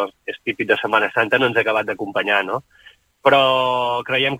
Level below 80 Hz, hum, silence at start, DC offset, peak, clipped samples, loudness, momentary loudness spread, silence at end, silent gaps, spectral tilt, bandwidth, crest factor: -62 dBFS; none; 0 s; under 0.1%; -2 dBFS; under 0.1%; -18 LUFS; 11 LU; 0 s; none; -5 dB/octave; 16.5 kHz; 18 dB